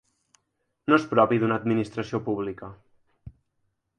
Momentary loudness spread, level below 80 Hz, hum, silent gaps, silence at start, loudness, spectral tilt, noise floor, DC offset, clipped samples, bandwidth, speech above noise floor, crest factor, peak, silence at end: 14 LU; -60 dBFS; none; none; 0.9 s; -25 LUFS; -7.5 dB/octave; -76 dBFS; under 0.1%; under 0.1%; 9.4 kHz; 52 dB; 22 dB; -6 dBFS; 0.7 s